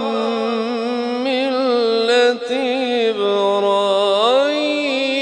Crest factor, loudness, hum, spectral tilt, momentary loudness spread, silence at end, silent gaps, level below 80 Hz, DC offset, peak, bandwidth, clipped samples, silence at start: 14 dB; -17 LUFS; none; -3.5 dB/octave; 6 LU; 0 s; none; -70 dBFS; under 0.1%; -4 dBFS; 10.5 kHz; under 0.1%; 0 s